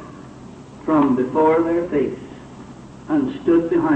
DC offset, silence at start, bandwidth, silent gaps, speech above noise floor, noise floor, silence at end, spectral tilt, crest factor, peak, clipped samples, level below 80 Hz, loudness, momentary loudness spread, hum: under 0.1%; 0 s; 8.4 kHz; none; 21 dB; -39 dBFS; 0 s; -8 dB/octave; 14 dB; -6 dBFS; under 0.1%; -50 dBFS; -19 LUFS; 23 LU; none